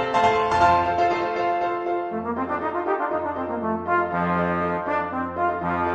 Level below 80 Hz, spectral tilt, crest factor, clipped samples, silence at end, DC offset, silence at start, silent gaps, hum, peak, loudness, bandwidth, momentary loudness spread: -50 dBFS; -6.5 dB/octave; 16 dB; under 0.1%; 0 s; under 0.1%; 0 s; none; none; -6 dBFS; -23 LUFS; 9.6 kHz; 8 LU